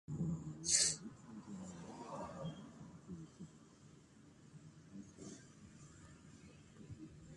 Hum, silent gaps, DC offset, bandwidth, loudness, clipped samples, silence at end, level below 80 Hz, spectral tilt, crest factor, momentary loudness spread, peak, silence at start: none; none; under 0.1%; 11.5 kHz; -40 LUFS; under 0.1%; 0 s; -68 dBFS; -2.5 dB/octave; 28 dB; 26 LU; -18 dBFS; 0.1 s